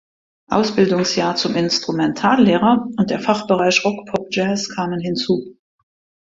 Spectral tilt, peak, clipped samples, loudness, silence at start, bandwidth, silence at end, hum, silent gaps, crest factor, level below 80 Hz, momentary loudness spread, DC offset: -5 dB/octave; 0 dBFS; under 0.1%; -18 LUFS; 0.5 s; 7.8 kHz; 0.7 s; none; none; 18 dB; -56 dBFS; 8 LU; under 0.1%